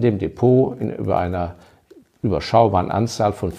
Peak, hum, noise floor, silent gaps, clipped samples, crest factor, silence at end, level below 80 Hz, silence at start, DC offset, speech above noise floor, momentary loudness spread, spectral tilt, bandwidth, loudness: -2 dBFS; none; -50 dBFS; none; under 0.1%; 18 dB; 0 s; -44 dBFS; 0 s; under 0.1%; 32 dB; 10 LU; -7.5 dB/octave; 13 kHz; -20 LUFS